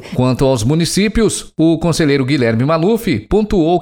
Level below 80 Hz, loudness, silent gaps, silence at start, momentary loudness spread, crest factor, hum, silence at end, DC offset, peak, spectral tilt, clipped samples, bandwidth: -30 dBFS; -14 LUFS; none; 0 s; 2 LU; 12 dB; none; 0 s; under 0.1%; -2 dBFS; -5.5 dB/octave; under 0.1%; 17.5 kHz